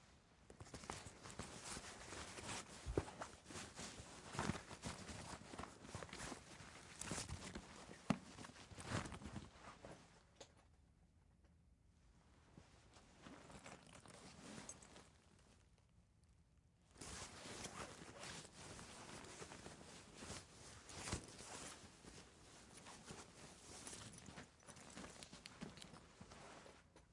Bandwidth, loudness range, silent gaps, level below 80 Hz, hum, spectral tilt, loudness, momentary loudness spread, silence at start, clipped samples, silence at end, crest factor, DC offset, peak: 11.5 kHz; 12 LU; none; -68 dBFS; none; -3.5 dB/octave; -54 LUFS; 15 LU; 0 s; under 0.1%; 0 s; 32 dB; under 0.1%; -24 dBFS